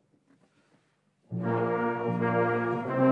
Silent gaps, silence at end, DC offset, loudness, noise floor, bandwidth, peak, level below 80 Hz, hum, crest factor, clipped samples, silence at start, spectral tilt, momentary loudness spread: none; 0 s; under 0.1%; -29 LUFS; -70 dBFS; 6 kHz; -12 dBFS; -72 dBFS; none; 16 dB; under 0.1%; 1.3 s; -10 dB/octave; 6 LU